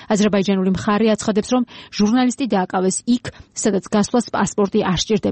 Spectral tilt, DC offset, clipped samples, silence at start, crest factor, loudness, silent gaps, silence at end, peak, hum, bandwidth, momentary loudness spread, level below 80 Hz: -5 dB/octave; under 0.1%; under 0.1%; 0 s; 12 dB; -19 LUFS; none; 0 s; -6 dBFS; none; 8.8 kHz; 5 LU; -46 dBFS